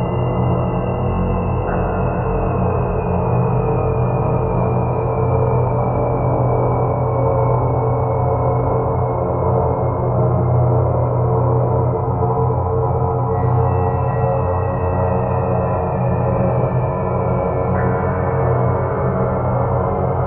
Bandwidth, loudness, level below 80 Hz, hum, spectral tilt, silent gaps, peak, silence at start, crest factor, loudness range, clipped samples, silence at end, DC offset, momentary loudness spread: 3 kHz; -18 LUFS; -30 dBFS; none; -10.5 dB/octave; none; -4 dBFS; 0 s; 12 dB; 1 LU; under 0.1%; 0 s; under 0.1%; 3 LU